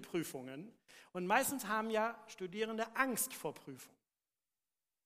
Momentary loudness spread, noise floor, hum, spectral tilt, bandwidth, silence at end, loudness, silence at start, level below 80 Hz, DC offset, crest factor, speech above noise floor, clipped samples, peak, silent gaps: 18 LU; under -90 dBFS; none; -3 dB/octave; 15.5 kHz; 1.2 s; -38 LUFS; 0 s; -82 dBFS; under 0.1%; 24 dB; over 51 dB; under 0.1%; -16 dBFS; none